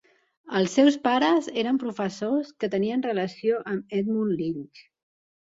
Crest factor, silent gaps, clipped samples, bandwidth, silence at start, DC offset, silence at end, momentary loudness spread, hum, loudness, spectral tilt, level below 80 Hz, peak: 18 dB; none; under 0.1%; 7.8 kHz; 0.45 s; under 0.1%; 0.7 s; 10 LU; none; -25 LUFS; -5.5 dB/octave; -70 dBFS; -8 dBFS